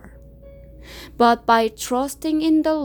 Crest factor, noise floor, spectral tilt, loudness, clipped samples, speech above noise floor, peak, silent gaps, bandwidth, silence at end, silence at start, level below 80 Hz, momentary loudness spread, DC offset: 18 dB; -43 dBFS; -4 dB/octave; -19 LUFS; under 0.1%; 24 dB; -2 dBFS; none; 20 kHz; 0 s; 0.05 s; -46 dBFS; 22 LU; under 0.1%